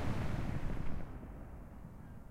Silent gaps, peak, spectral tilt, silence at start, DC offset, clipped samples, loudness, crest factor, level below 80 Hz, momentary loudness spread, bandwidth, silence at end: none; -22 dBFS; -7.5 dB/octave; 0 s; under 0.1%; under 0.1%; -44 LUFS; 16 dB; -44 dBFS; 13 LU; 10.5 kHz; 0 s